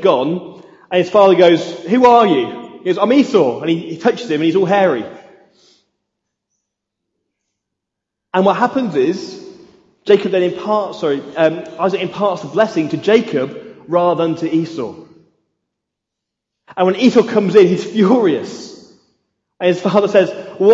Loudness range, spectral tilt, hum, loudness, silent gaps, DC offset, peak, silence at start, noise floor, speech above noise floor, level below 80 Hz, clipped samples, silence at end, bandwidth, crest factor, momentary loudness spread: 8 LU; -6.5 dB/octave; none; -15 LUFS; none; under 0.1%; 0 dBFS; 0 s; -80 dBFS; 66 dB; -64 dBFS; under 0.1%; 0 s; 7.8 kHz; 16 dB; 14 LU